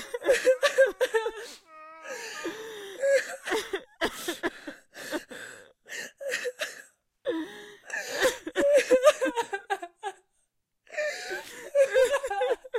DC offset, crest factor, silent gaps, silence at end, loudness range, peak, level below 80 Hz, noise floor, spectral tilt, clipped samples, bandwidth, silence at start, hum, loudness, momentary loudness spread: under 0.1%; 22 dB; none; 0 s; 9 LU; -6 dBFS; -64 dBFS; -75 dBFS; -1.5 dB/octave; under 0.1%; 16 kHz; 0 s; none; -28 LUFS; 20 LU